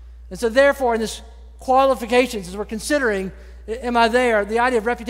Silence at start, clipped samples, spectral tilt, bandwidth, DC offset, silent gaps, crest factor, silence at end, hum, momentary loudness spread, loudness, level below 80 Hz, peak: 0 s; under 0.1%; -4 dB/octave; 16 kHz; under 0.1%; none; 18 dB; 0 s; none; 16 LU; -19 LUFS; -40 dBFS; -2 dBFS